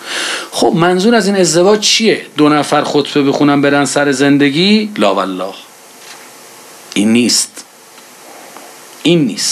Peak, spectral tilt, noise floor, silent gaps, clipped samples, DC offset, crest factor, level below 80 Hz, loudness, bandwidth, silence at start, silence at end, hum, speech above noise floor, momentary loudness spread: 0 dBFS; -4 dB/octave; -38 dBFS; none; under 0.1%; under 0.1%; 12 dB; -58 dBFS; -11 LUFS; 14 kHz; 0 s; 0 s; none; 27 dB; 23 LU